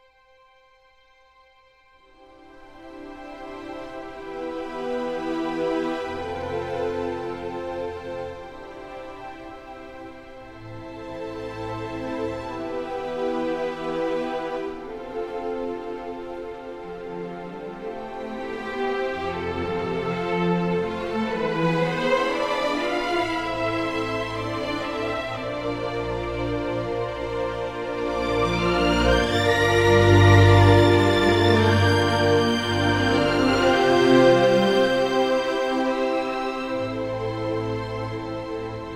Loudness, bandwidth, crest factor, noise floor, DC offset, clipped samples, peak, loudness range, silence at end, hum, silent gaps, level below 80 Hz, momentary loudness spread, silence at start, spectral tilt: -23 LUFS; 13.5 kHz; 22 dB; -57 dBFS; under 0.1%; under 0.1%; -2 dBFS; 17 LU; 0 s; none; none; -42 dBFS; 18 LU; 2.2 s; -6 dB/octave